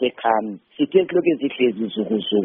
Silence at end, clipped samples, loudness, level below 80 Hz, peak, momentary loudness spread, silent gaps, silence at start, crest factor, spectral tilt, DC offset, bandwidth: 0 s; under 0.1%; -21 LUFS; -66 dBFS; -4 dBFS; 8 LU; none; 0 s; 16 dB; -4 dB/octave; under 0.1%; 3.8 kHz